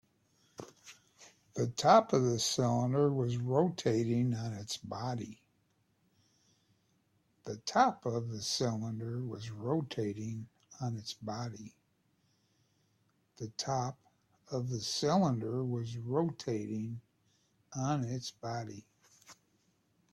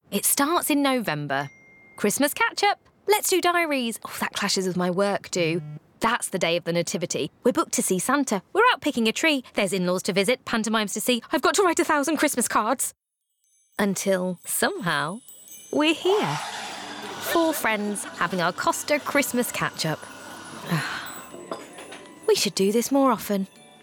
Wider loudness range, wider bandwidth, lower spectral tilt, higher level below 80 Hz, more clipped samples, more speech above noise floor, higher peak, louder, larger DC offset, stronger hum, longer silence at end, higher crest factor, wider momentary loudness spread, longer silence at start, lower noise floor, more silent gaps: first, 12 LU vs 4 LU; second, 13.5 kHz vs 19 kHz; first, -5.5 dB/octave vs -3.5 dB/octave; second, -72 dBFS vs -64 dBFS; neither; second, 41 dB vs 49 dB; about the same, -12 dBFS vs -10 dBFS; second, -34 LUFS vs -24 LUFS; neither; neither; first, 0.8 s vs 0.35 s; first, 24 dB vs 16 dB; first, 17 LU vs 13 LU; first, 0.6 s vs 0.1 s; about the same, -75 dBFS vs -73 dBFS; neither